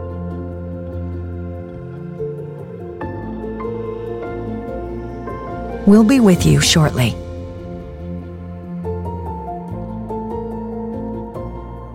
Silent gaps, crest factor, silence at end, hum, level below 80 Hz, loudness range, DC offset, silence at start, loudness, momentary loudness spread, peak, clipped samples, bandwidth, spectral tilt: none; 18 dB; 0 s; none; -36 dBFS; 13 LU; under 0.1%; 0 s; -20 LUFS; 19 LU; -2 dBFS; under 0.1%; 16 kHz; -5.5 dB/octave